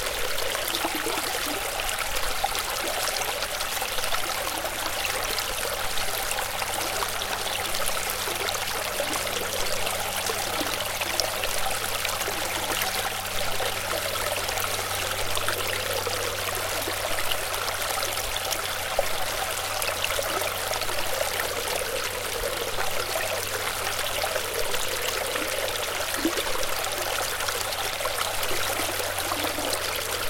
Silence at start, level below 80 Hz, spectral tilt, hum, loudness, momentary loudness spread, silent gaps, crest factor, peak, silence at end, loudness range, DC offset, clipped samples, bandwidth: 0 s; -44 dBFS; -1 dB/octave; none; -26 LUFS; 2 LU; none; 24 dB; -2 dBFS; 0 s; 1 LU; under 0.1%; under 0.1%; 17 kHz